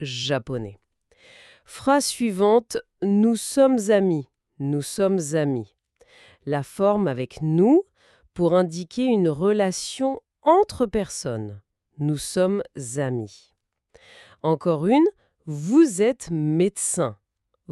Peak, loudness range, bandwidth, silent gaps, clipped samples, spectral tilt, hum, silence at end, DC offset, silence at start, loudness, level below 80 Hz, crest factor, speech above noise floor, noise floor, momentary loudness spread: -4 dBFS; 4 LU; 13.5 kHz; none; under 0.1%; -5.5 dB/octave; none; 0 s; under 0.1%; 0 s; -22 LUFS; -56 dBFS; 18 dB; 34 dB; -56 dBFS; 13 LU